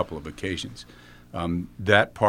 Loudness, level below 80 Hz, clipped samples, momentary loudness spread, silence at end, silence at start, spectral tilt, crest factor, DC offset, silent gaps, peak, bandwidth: -26 LUFS; -50 dBFS; under 0.1%; 19 LU; 0 s; 0 s; -5.5 dB/octave; 24 dB; under 0.1%; none; -2 dBFS; 16 kHz